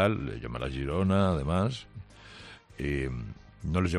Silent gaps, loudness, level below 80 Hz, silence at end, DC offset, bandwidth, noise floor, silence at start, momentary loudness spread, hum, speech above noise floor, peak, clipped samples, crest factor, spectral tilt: none; -31 LUFS; -44 dBFS; 0 s; under 0.1%; 11 kHz; -49 dBFS; 0 s; 21 LU; none; 21 dB; -12 dBFS; under 0.1%; 18 dB; -7 dB/octave